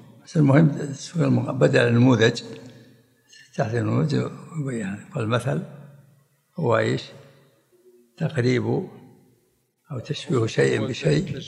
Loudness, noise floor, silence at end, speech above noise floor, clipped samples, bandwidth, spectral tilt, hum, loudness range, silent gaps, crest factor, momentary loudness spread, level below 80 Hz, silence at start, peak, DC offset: -22 LUFS; -67 dBFS; 0 s; 45 dB; under 0.1%; 11.5 kHz; -7 dB/octave; none; 7 LU; none; 20 dB; 17 LU; -58 dBFS; 0.3 s; -2 dBFS; under 0.1%